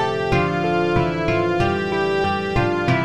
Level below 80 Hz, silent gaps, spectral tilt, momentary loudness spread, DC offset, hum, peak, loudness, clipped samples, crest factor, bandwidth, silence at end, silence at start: -38 dBFS; none; -7 dB/octave; 2 LU; 0.7%; none; -6 dBFS; -20 LUFS; under 0.1%; 14 dB; 10 kHz; 0 s; 0 s